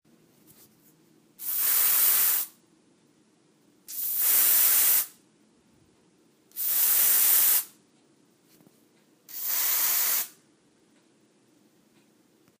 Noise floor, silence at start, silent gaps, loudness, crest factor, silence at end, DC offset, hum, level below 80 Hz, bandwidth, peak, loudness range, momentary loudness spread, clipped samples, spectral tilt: -63 dBFS; 1.4 s; none; -21 LUFS; 20 dB; 2.3 s; under 0.1%; none; -88 dBFS; 15.5 kHz; -8 dBFS; 6 LU; 18 LU; under 0.1%; 2.5 dB/octave